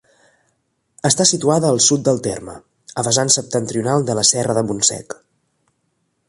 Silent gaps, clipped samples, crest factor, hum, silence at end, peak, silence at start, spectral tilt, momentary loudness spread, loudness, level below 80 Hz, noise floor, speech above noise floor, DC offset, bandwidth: none; under 0.1%; 20 dB; none; 1.15 s; 0 dBFS; 1.05 s; -3.5 dB/octave; 16 LU; -16 LUFS; -56 dBFS; -68 dBFS; 51 dB; under 0.1%; 11.5 kHz